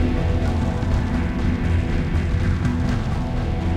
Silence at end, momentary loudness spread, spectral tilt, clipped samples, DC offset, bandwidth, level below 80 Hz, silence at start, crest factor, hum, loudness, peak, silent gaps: 0 s; 3 LU; -8 dB/octave; under 0.1%; under 0.1%; 9.4 kHz; -24 dBFS; 0 s; 12 dB; none; -22 LUFS; -8 dBFS; none